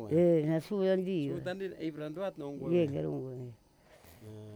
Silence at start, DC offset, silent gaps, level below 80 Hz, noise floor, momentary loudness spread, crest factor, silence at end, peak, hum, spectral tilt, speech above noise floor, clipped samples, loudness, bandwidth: 0 s; under 0.1%; none; -68 dBFS; -60 dBFS; 20 LU; 16 dB; 0 s; -18 dBFS; none; -8.5 dB/octave; 27 dB; under 0.1%; -33 LUFS; 17 kHz